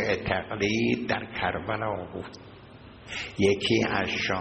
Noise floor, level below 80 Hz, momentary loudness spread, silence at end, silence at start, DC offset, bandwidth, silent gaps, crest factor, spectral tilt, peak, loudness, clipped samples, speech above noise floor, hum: -48 dBFS; -54 dBFS; 16 LU; 0 s; 0 s; under 0.1%; 8.4 kHz; none; 20 dB; -5 dB/octave; -8 dBFS; -27 LUFS; under 0.1%; 20 dB; none